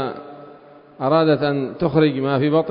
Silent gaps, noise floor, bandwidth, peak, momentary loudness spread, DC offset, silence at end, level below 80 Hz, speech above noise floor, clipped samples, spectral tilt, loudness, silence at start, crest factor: none; -45 dBFS; 5.4 kHz; -4 dBFS; 13 LU; under 0.1%; 0 s; -54 dBFS; 27 dB; under 0.1%; -12 dB/octave; -19 LUFS; 0 s; 16 dB